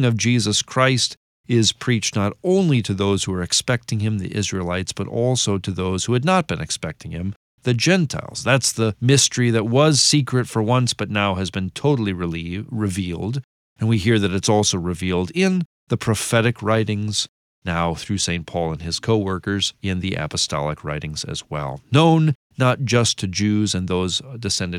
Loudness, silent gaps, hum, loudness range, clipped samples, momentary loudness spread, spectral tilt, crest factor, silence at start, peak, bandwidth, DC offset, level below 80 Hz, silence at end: -20 LUFS; 1.17-1.44 s, 7.36-7.58 s, 13.44-13.76 s, 15.65-15.87 s, 17.29-17.62 s, 22.35-22.50 s; none; 5 LU; under 0.1%; 10 LU; -4.5 dB/octave; 16 dB; 0 s; -4 dBFS; 15.5 kHz; under 0.1%; -48 dBFS; 0 s